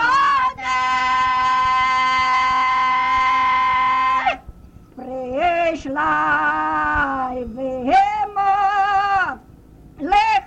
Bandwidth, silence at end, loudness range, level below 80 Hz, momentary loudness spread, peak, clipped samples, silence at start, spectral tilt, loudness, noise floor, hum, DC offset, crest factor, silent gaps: 8.8 kHz; 0 s; 4 LU; -44 dBFS; 9 LU; -4 dBFS; under 0.1%; 0 s; -3.5 dB/octave; -18 LUFS; -44 dBFS; none; under 0.1%; 14 dB; none